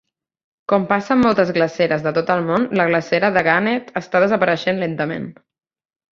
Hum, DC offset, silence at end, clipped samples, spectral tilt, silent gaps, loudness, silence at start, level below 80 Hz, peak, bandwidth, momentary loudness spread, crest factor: none; under 0.1%; 0.8 s; under 0.1%; -6.5 dB/octave; none; -18 LUFS; 0.7 s; -56 dBFS; -2 dBFS; 7.4 kHz; 8 LU; 18 dB